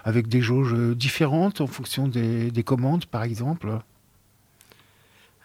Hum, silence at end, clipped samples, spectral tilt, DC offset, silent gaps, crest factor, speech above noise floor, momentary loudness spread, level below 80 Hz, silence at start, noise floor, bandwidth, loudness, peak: none; 1.65 s; under 0.1%; -6.5 dB/octave; under 0.1%; none; 16 dB; 37 dB; 7 LU; -62 dBFS; 0.05 s; -60 dBFS; 16 kHz; -24 LUFS; -8 dBFS